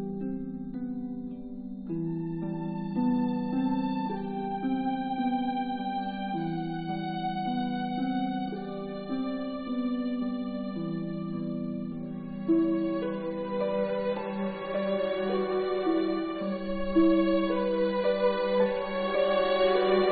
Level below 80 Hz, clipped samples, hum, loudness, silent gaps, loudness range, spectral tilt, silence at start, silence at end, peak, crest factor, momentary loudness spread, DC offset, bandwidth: -56 dBFS; under 0.1%; none; -30 LUFS; none; 6 LU; -10.5 dB/octave; 0 s; 0 s; -12 dBFS; 16 dB; 10 LU; under 0.1%; 4.8 kHz